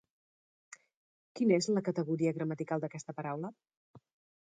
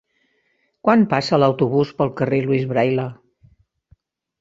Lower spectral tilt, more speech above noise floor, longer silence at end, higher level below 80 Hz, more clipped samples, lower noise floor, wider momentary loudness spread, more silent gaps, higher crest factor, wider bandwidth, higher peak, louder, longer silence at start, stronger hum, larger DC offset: second, -6 dB/octave vs -7.5 dB/octave; first, over 56 dB vs 49 dB; second, 0.45 s vs 1.25 s; second, -82 dBFS vs -58 dBFS; neither; first, under -90 dBFS vs -66 dBFS; first, 12 LU vs 6 LU; first, 3.77-3.94 s vs none; about the same, 20 dB vs 18 dB; first, 9.4 kHz vs 7.8 kHz; second, -16 dBFS vs -2 dBFS; second, -34 LUFS vs -19 LUFS; first, 1.35 s vs 0.85 s; neither; neither